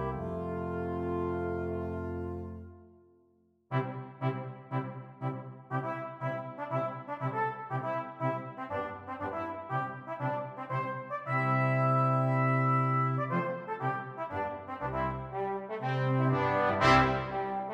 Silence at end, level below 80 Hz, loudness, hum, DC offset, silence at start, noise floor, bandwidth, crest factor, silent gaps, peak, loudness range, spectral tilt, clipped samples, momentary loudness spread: 0 s; -54 dBFS; -32 LUFS; none; under 0.1%; 0 s; -68 dBFS; 7.8 kHz; 22 dB; none; -12 dBFS; 9 LU; -7.5 dB/octave; under 0.1%; 11 LU